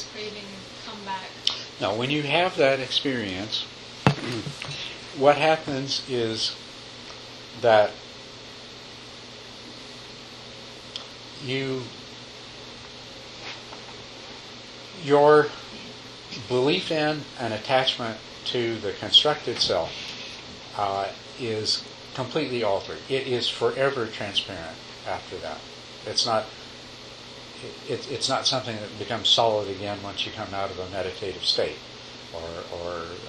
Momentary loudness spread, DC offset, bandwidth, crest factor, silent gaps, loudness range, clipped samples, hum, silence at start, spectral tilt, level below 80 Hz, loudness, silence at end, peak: 20 LU; under 0.1%; 11.5 kHz; 28 dB; none; 11 LU; under 0.1%; none; 0 s; -4 dB/octave; -58 dBFS; -25 LUFS; 0 s; 0 dBFS